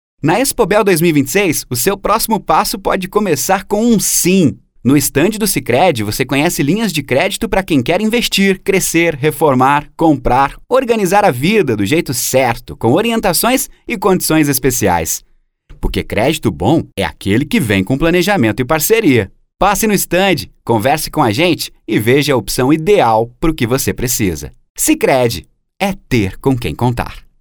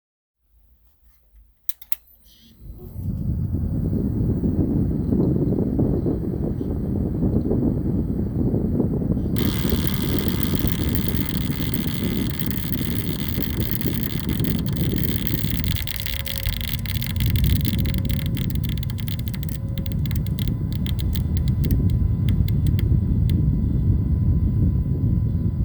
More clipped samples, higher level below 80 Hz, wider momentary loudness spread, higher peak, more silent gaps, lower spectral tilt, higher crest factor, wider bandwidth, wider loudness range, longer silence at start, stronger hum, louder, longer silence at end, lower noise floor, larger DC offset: neither; about the same, -32 dBFS vs -28 dBFS; about the same, 6 LU vs 5 LU; about the same, 0 dBFS vs -2 dBFS; first, 24.70-24.75 s vs none; second, -4.5 dB/octave vs -7 dB/octave; second, 14 dB vs 20 dB; about the same, over 20 kHz vs over 20 kHz; about the same, 3 LU vs 4 LU; second, 0.25 s vs 1.7 s; neither; first, -13 LUFS vs -23 LUFS; first, 0.2 s vs 0 s; second, -41 dBFS vs -57 dBFS; neither